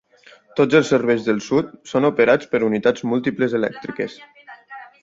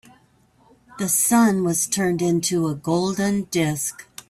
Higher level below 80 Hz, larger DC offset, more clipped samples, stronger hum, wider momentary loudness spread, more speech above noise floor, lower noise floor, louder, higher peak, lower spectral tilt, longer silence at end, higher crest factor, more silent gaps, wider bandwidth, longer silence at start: about the same, -60 dBFS vs -58 dBFS; neither; neither; neither; first, 13 LU vs 7 LU; second, 31 dB vs 37 dB; second, -50 dBFS vs -58 dBFS; about the same, -19 LUFS vs -21 LUFS; first, -2 dBFS vs -6 dBFS; first, -6 dB/octave vs -4.5 dB/octave; about the same, 0.2 s vs 0.25 s; about the same, 18 dB vs 16 dB; neither; second, 7.8 kHz vs 16 kHz; second, 0.55 s vs 0.9 s